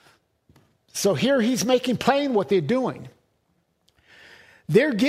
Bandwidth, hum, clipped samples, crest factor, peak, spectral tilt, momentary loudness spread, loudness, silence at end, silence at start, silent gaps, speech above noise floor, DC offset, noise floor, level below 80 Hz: 16 kHz; none; under 0.1%; 20 dB; -4 dBFS; -5 dB/octave; 11 LU; -22 LUFS; 0 s; 0.95 s; none; 48 dB; under 0.1%; -69 dBFS; -64 dBFS